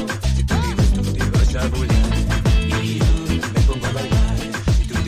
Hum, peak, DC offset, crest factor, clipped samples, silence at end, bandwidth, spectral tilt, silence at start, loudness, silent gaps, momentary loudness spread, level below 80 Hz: none; -4 dBFS; under 0.1%; 12 dB; under 0.1%; 0 s; 15 kHz; -6 dB/octave; 0 s; -19 LUFS; none; 3 LU; -20 dBFS